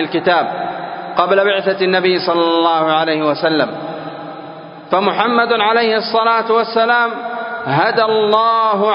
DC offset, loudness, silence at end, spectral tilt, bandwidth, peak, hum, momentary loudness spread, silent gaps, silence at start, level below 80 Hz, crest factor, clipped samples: under 0.1%; -14 LUFS; 0 s; -8 dB/octave; 5.4 kHz; 0 dBFS; none; 13 LU; none; 0 s; -64 dBFS; 14 dB; under 0.1%